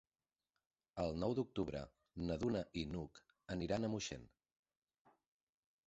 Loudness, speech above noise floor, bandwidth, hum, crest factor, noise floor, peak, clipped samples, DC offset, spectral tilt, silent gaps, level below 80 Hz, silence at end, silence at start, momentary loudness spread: -43 LUFS; over 48 dB; 8 kHz; none; 20 dB; under -90 dBFS; -26 dBFS; under 0.1%; under 0.1%; -6 dB/octave; none; -62 dBFS; 1.6 s; 0.95 s; 14 LU